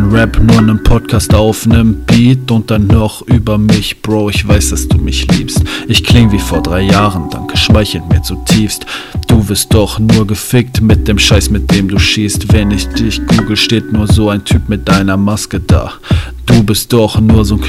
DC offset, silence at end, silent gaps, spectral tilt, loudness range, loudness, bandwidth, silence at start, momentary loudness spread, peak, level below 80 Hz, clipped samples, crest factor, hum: under 0.1%; 0 s; none; -5.5 dB/octave; 2 LU; -10 LUFS; 15 kHz; 0 s; 6 LU; 0 dBFS; -18 dBFS; 3%; 10 dB; none